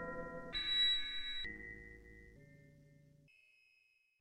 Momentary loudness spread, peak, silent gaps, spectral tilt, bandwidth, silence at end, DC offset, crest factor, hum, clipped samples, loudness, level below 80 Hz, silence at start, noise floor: 26 LU; -26 dBFS; none; -2.5 dB/octave; 11 kHz; 1.25 s; under 0.1%; 18 dB; none; under 0.1%; -37 LUFS; -60 dBFS; 0 s; -75 dBFS